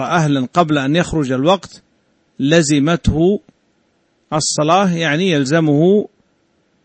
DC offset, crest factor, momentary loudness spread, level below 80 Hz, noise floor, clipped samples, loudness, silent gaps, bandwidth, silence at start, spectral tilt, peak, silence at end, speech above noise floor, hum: under 0.1%; 16 dB; 6 LU; -38 dBFS; -61 dBFS; under 0.1%; -15 LUFS; none; 8.8 kHz; 0 s; -5 dB/octave; 0 dBFS; 0.8 s; 47 dB; none